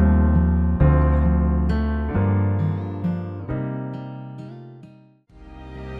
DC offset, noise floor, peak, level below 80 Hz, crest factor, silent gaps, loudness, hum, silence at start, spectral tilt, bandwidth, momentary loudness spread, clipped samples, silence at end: under 0.1%; -49 dBFS; -4 dBFS; -24 dBFS; 16 dB; none; -21 LUFS; none; 0 s; -11 dB/octave; 4.7 kHz; 20 LU; under 0.1%; 0 s